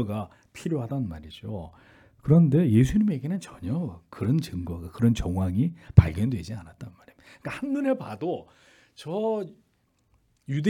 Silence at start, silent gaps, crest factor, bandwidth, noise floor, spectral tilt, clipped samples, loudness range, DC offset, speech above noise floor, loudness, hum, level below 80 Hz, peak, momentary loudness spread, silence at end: 0 s; none; 26 dB; 13.5 kHz; -68 dBFS; -8.5 dB/octave; under 0.1%; 7 LU; under 0.1%; 43 dB; -26 LUFS; none; -44 dBFS; 0 dBFS; 20 LU; 0 s